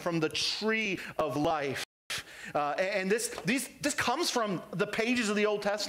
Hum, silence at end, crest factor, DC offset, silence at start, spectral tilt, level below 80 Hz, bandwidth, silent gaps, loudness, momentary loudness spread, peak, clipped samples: none; 0 s; 14 dB; under 0.1%; 0 s; -3.5 dB/octave; -64 dBFS; 16 kHz; 1.85-2.10 s; -31 LUFS; 7 LU; -18 dBFS; under 0.1%